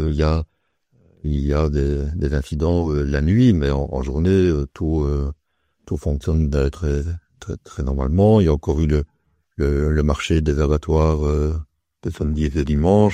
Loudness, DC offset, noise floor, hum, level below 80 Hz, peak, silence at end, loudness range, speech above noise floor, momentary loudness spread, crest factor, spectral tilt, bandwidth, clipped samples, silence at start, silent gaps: -20 LUFS; under 0.1%; -63 dBFS; none; -26 dBFS; -2 dBFS; 0 s; 3 LU; 44 dB; 14 LU; 18 dB; -8 dB/octave; 9 kHz; under 0.1%; 0 s; none